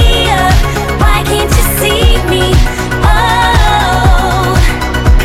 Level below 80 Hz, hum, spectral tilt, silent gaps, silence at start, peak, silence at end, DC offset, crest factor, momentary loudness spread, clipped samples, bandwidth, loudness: -12 dBFS; none; -4.5 dB/octave; none; 0 s; 0 dBFS; 0 s; under 0.1%; 8 dB; 3 LU; 0.7%; 16.5 kHz; -10 LUFS